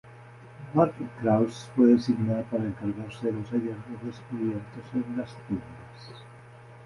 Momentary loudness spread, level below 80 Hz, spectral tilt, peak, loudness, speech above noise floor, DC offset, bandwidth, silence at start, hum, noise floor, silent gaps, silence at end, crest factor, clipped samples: 23 LU; -60 dBFS; -8.5 dB/octave; -8 dBFS; -28 LUFS; 21 dB; under 0.1%; 11 kHz; 0.05 s; none; -48 dBFS; none; 0 s; 20 dB; under 0.1%